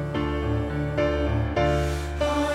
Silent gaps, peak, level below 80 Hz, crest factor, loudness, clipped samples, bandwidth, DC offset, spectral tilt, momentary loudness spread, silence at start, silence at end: none; -12 dBFS; -32 dBFS; 12 dB; -25 LUFS; under 0.1%; 13.5 kHz; under 0.1%; -6.5 dB/octave; 4 LU; 0 s; 0 s